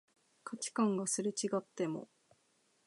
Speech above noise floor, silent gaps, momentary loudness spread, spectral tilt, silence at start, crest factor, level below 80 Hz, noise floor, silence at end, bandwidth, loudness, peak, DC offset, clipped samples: 38 dB; none; 13 LU; -4.5 dB/octave; 0.45 s; 18 dB; under -90 dBFS; -75 dBFS; 0.8 s; 11.5 kHz; -36 LUFS; -20 dBFS; under 0.1%; under 0.1%